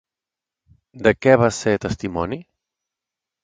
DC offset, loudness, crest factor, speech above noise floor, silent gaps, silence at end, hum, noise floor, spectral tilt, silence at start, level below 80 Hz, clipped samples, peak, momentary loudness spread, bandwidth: under 0.1%; -19 LUFS; 22 dB; 69 dB; none; 1 s; none; -88 dBFS; -6 dB/octave; 0.95 s; -46 dBFS; under 0.1%; 0 dBFS; 12 LU; 9.4 kHz